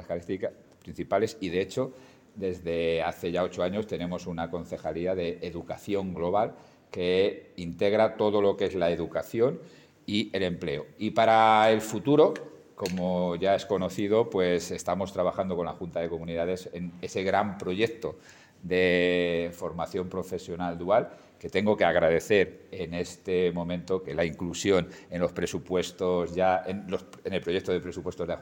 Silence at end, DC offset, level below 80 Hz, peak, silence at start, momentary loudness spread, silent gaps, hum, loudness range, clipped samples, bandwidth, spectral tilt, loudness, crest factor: 0 s; under 0.1%; -62 dBFS; -8 dBFS; 0 s; 12 LU; none; none; 6 LU; under 0.1%; 17 kHz; -5.5 dB/octave; -28 LUFS; 20 dB